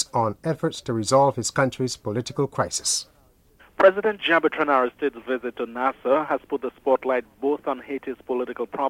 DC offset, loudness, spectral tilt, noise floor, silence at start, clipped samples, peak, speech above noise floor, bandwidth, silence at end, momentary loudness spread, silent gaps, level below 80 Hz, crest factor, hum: under 0.1%; -24 LUFS; -4 dB/octave; -57 dBFS; 0 s; under 0.1%; -4 dBFS; 34 dB; 15.5 kHz; 0 s; 10 LU; none; -60 dBFS; 20 dB; none